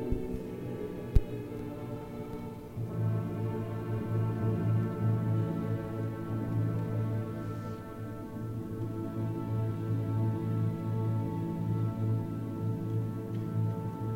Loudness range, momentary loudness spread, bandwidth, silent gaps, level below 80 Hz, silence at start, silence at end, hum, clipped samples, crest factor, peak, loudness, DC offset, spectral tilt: 4 LU; 9 LU; 15.5 kHz; none; -44 dBFS; 0 s; 0 s; none; under 0.1%; 24 dB; -8 dBFS; -34 LUFS; under 0.1%; -9.5 dB/octave